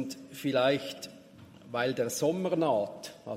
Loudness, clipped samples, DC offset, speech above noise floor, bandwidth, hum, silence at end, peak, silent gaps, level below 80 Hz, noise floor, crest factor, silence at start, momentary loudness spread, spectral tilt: -30 LUFS; under 0.1%; under 0.1%; 23 dB; 16 kHz; none; 0 s; -12 dBFS; none; -76 dBFS; -53 dBFS; 18 dB; 0 s; 14 LU; -4.5 dB/octave